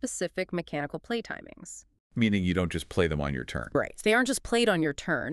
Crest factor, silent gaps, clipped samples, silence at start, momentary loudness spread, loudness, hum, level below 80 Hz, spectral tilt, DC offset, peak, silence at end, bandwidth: 18 dB; 2.00-2.10 s; under 0.1%; 0.05 s; 15 LU; -28 LUFS; none; -48 dBFS; -5 dB/octave; under 0.1%; -10 dBFS; 0 s; 13.5 kHz